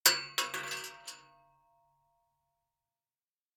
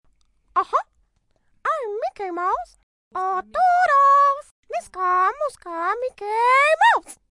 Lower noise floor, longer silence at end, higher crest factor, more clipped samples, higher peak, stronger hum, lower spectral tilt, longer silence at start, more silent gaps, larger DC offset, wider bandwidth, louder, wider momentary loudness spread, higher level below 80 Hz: first, under -90 dBFS vs -66 dBFS; first, 2.35 s vs 0.2 s; first, 32 dB vs 16 dB; neither; about the same, -6 dBFS vs -6 dBFS; neither; second, 1 dB/octave vs -1.5 dB/octave; second, 0.05 s vs 0.55 s; second, none vs 2.83-3.11 s, 4.51-4.63 s; neither; first, over 20 kHz vs 11.5 kHz; second, -33 LUFS vs -20 LUFS; first, 18 LU vs 14 LU; second, -84 dBFS vs -62 dBFS